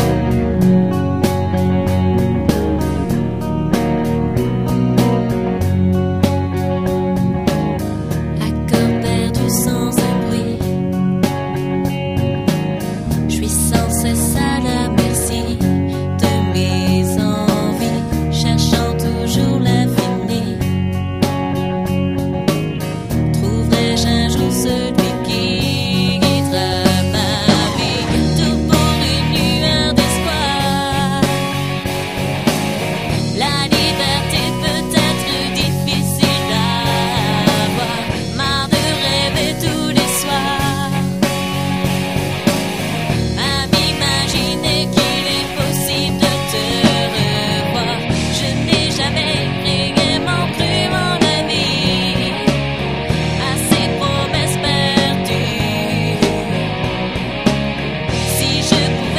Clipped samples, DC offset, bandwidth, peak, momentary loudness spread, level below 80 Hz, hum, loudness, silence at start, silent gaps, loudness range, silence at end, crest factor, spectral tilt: under 0.1%; 0.4%; 15.5 kHz; 0 dBFS; 5 LU; -30 dBFS; none; -16 LUFS; 0 s; none; 2 LU; 0 s; 16 dB; -5 dB/octave